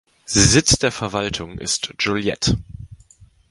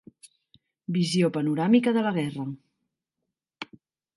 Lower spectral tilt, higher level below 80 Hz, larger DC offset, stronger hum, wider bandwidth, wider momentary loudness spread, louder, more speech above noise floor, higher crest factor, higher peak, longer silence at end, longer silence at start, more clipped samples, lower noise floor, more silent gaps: second, -3 dB/octave vs -6.5 dB/octave; first, -36 dBFS vs -74 dBFS; neither; neither; about the same, 11.5 kHz vs 11.5 kHz; second, 12 LU vs 21 LU; first, -18 LUFS vs -25 LUFS; second, 31 dB vs 61 dB; about the same, 20 dB vs 20 dB; first, 0 dBFS vs -8 dBFS; about the same, 0.55 s vs 0.55 s; second, 0.3 s vs 0.9 s; neither; second, -50 dBFS vs -84 dBFS; neither